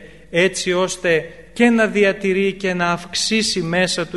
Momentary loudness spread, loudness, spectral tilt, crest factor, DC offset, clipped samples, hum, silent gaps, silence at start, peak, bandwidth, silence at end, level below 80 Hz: 5 LU; -18 LUFS; -4 dB/octave; 16 dB; 0.4%; under 0.1%; none; none; 0 s; -2 dBFS; 11.5 kHz; 0 s; -50 dBFS